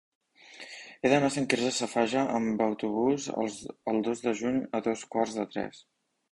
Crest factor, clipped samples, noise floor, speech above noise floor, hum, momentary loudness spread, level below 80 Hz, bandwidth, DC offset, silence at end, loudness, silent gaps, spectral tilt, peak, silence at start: 22 dB; under 0.1%; -50 dBFS; 21 dB; none; 11 LU; -66 dBFS; 11.5 kHz; under 0.1%; 0.5 s; -29 LUFS; none; -4.5 dB/octave; -8 dBFS; 0.5 s